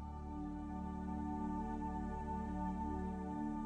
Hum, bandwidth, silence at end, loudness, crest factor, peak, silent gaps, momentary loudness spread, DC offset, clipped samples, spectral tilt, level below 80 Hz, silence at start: none; 10 kHz; 0 s; -43 LUFS; 12 dB; -30 dBFS; none; 4 LU; under 0.1%; under 0.1%; -9 dB/octave; -50 dBFS; 0 s